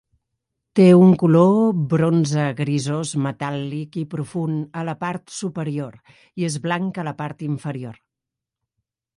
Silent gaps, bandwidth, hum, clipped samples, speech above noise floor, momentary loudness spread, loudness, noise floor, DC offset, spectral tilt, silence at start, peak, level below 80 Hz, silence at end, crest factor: none; 11 kHz; none; under 0.1%; 66 dB; 15 LU; -20 LUFS; -85 dBFS; under 0.1%; -7 dB/octave; 0.75 s; -4 dBFS; -62 dBFS; 1.25 s; 18 dB